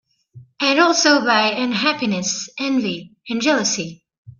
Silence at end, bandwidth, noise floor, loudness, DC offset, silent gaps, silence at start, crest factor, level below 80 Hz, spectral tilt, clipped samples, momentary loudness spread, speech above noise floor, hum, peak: 0.1 s; 10 kHz; -46 dBFS; -18 LUFS; under 0.1%; 4.18-4.25 s; 0.35 s; 18 dB; -64 dBFS; -2.5 dB/octave; under 0.1%; 12 LU; 27 dB; none; -2 dBFS